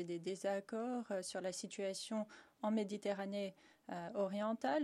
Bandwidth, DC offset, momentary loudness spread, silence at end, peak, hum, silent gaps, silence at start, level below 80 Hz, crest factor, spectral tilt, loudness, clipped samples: 13.5 kHz; under 0.1%; 8 LU; 0 s; -26 dBFS; none; none; 0 s; -88 dBFS; 16 dB; -4.5 dB/octave; -42 LUFS; under 0.1%